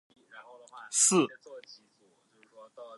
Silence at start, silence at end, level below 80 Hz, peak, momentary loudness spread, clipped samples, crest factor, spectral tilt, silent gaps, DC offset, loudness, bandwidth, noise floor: 0.35 s; 0 s; -88 dBFS; -12 dBFS; 27 LU; under 0.1%; 22 dB; -2.5 dB/octave; none; under 0.1%; -26 LUFS; 11.5 kHz; -68 dBFS